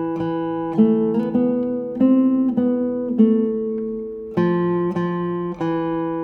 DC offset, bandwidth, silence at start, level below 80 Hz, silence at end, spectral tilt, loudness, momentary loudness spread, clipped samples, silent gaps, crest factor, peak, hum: under 0.1%; 4.5 kHz; 0 s; -54 dBFS; 0 s; -10 dB/octave; -20 LUFS; 8 LU; under 0.1%; none; 16 dB; -4 dBFS; none